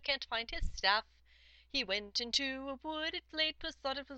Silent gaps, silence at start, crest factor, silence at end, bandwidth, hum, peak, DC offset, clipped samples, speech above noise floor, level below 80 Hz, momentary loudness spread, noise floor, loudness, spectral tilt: none; 0 s; 24 dB; 0 s; 8.6 kHz; none; -14 dBFS; under 0.1%; under 0.1%; 26 dB; -50 dBFS; 9 LU; -64 dBFS; -36 LUFS; -2 dB/octave